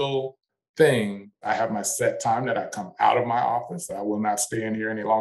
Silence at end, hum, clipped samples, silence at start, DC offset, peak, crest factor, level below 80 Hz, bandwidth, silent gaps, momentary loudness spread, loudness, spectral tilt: 0 s; none; under 0.1%; 0 s; under 0.1%; -6 dBFS; 18 dB; -66 dBFS; 13 kHz; 0.69-0.74 s; 11 LU; -25 LUFS; -4 dB/octave